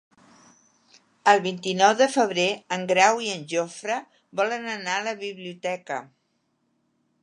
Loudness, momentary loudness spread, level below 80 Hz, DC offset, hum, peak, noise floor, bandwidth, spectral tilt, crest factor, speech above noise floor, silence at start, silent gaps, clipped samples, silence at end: -24 LUFS; 13 LU; -80 dBFS; under 0.1%; none; -2 dBFS; -72 dBFS; 11 kHz; -3 dB/octave; 24 dB; 48 dB; 1.25 s; none; under 0.1%; 1.2 s